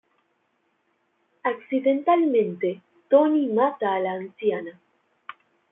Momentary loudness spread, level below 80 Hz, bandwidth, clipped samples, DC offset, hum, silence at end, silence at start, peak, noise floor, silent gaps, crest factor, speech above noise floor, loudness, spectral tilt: 21 LU; -78 dBFS; 3.9 kHz; under 0.1%; under 0.1%; none; 1 s; 1.45 s; -6 dBFS; -71 dBFS; none; 18 dB; 48 dB; -23 LUFS; -10 dB/octave